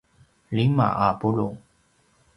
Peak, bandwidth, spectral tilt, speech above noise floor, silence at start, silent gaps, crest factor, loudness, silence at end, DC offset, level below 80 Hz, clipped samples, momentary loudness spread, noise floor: -6 dBFS; 10.5 kHz; -9 dB/octave; 41 dB; 0.5 s; none; 20 dB; -23 LUFS; 0.8 s; under 0.1%; -54 dBFS; under 0.1%; 10 LU; -63 dBFS